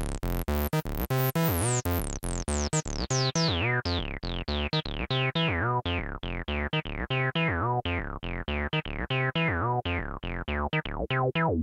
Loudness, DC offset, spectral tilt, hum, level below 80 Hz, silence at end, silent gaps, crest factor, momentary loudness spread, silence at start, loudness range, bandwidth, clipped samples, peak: -29 LUFS; under 0.1%; -4.5 dB/octave; none; -38 dBFS; 0 s; none; 16 dB; 7 LU; 0 s; 2 LU; 17 kHz; under 0.1%; -12 dBFS